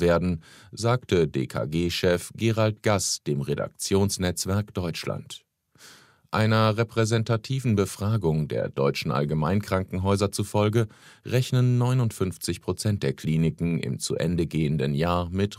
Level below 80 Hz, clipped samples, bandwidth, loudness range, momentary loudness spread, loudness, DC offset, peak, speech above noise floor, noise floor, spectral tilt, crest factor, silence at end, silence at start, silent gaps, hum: -50 dBFS; under 0.1%; 16 kHz; 2 LU; 7 LU; -25 LUFS; under 0.1%; -8 dBFS; 29 dB; -53 dBFS; -5.5 dB/octave; 18 dB; 0.05 s; 0 s; none; none